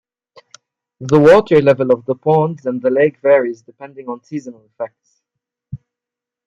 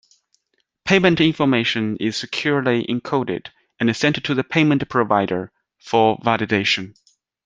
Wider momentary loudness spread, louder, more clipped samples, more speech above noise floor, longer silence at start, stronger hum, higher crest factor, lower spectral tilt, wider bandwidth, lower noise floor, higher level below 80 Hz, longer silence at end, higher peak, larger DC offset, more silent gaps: first, 25 LU vs 8 LU; first, -13 LUFS vs -19 LUFS; neither; first, 72 dB vs 52 dB; first, 1 s vs 0.85 s; neither; about the same, 16 dB vs 18 dB; first, -7.5 dB/octave vs -5.5 dB/octave; second, 7.8 kHz vs 9.6 kHz; first, -86 dBFS vs -71 dBFS; about the same, -54 dBFS vs -56 dBFS; first, 0.7 s vs 0.55 s; about the same, 0 dBFS vs -2 dBFS; neither; neither